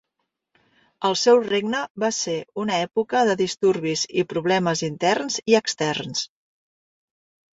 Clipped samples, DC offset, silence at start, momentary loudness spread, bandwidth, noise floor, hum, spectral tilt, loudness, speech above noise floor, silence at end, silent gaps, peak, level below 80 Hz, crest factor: under 0.1%; under 0.1%; 1 s; 8 LU; 7.8 kHz; -78 dBFS; none; -3.5 dB/octave; -22 LUFS; 56 dB; 1.3 s; 1.90-1.95 s; -4 dBFS; -66 dBFS; 20 dB